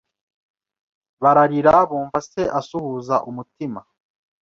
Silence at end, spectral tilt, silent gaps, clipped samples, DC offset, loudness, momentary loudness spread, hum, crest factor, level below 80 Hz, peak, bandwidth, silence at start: 0.6 s; -7 dB/octave; none; under 0.1%; under 0.1%; -19 LUFS; 16 LU; none; 20 dB; -54 dBFS; -2 dBFS; 7.4 kHz; 1.2 s